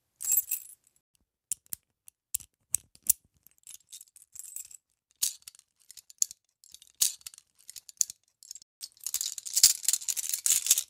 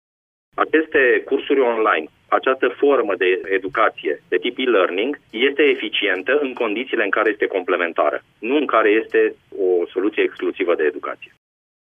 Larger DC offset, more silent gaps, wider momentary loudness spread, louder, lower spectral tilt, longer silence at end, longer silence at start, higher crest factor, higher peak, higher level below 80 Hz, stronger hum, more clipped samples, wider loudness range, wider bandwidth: neither; first, 1.00-1.14 s, 8.62-8.81 s vs none; first, 24 LU vs 7 LU; second, -28 LUFS vs -19 LUFS; second, 4 dB/octave vs -6 dB/octave; second, 0.05 s vs 0.65 s; second, 0.2 s vs 0.55 s; first, 30 dB vs 18 dB; about the same, -2 dBFS vs -2 dBFS; second, -74 dBFS vs -66 dBFS; neither; neither; first, 9 LU vs 2 LU; first, 16.5 kHz vs 3.8 kHz